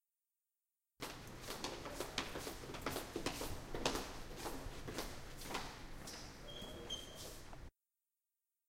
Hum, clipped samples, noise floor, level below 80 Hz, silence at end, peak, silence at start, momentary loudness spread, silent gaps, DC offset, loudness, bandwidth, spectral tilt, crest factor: none; under 0.1%; under -90 dBFS; -56 dBFS; 1 s; -20 dBFS; 1 s; 9 LU; none; under 0.1%; -47 LUFS; 16.5 kHz; -3 dB/octave; 28 dB